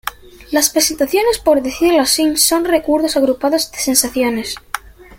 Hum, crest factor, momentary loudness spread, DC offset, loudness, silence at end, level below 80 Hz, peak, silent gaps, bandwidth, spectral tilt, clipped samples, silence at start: none; 16 dB; 11 LU; under 0.1%; -14 LUFS; 0.05 s; -44 dBFS; 0 dBFS; none; 17 kHz; -1.5 dB/octave; under 0.1%; 0.05 s